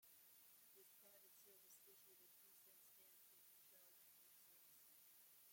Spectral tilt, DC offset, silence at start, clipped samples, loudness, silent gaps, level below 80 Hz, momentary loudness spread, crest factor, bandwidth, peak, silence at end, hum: -0.5 dB/octave; under 0.1%; 0 s; under 0.1%; -66 LUFS; none; under -90 dBFS; 1 LU; 14 dB; 16.5 kHz; -56 dBFS; 0 s; none